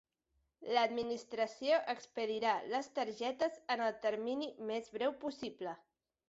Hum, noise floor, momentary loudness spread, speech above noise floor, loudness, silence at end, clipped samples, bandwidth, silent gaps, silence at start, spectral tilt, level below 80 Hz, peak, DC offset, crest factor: none; -82 dBFS; 10 LU; 44 dB; -38 LUFS; 0.5 s; under 0.1%; 8 kHz; none; 0.6 s; -1 dB/octave; -80 dBFS; -20 dBFS; under 0.1%; 20 dB